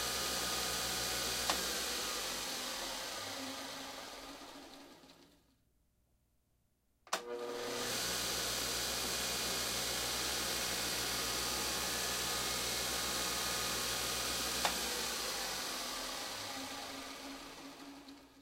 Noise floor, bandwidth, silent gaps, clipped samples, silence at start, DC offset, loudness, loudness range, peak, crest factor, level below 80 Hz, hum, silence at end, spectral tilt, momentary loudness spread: -77 dBFS; 16 kHz; none; under 0.1%; 0 s; under 0.1%; -36 LUFS; 12 LU; -18 dBFS; 22 dB; -60 dBFS; none; 0 s; -1 dB/octave; 13 LU